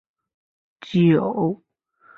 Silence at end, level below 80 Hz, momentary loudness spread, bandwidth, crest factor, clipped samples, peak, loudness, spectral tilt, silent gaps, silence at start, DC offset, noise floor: 0.6 s; -62 dBFS; 9 LU; 6.6 kHz; 16 dB; under 0.1%; -6 dBFS; -20 LUFS; -9 dB/octave; none; 0.8 s; under 0.1%; -55 dBFS